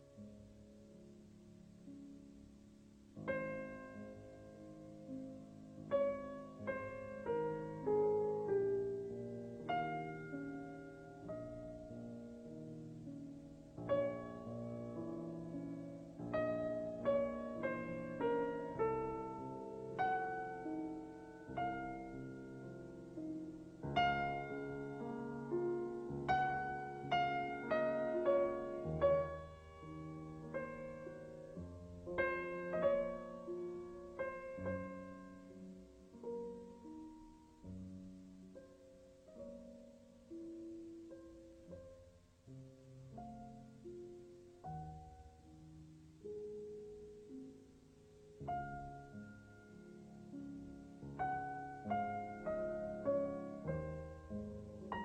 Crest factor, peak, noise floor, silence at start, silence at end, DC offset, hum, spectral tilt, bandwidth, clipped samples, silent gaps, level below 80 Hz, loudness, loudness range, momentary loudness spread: 22 dB; -22 dBFS; -64 dBFS; 0 s; 0 s; under 0.1%; none; -7.5 dB/octave; 9.2 kHz; under 0.1%; none; -66 dBFS; -43 LUFS; 15 LU; 21 LU